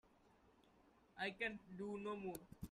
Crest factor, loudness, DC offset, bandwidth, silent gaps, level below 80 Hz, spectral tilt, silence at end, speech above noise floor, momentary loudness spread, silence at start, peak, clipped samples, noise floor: 20 dB; -48 LUFS; under 0.1%; 13.5 kHz; none; -72 dBFS; -5 dB/octave; 0 s; 24 dB; 9 LU; 0.05 s; -30 dBFS; under 0.1%; -73 dBFS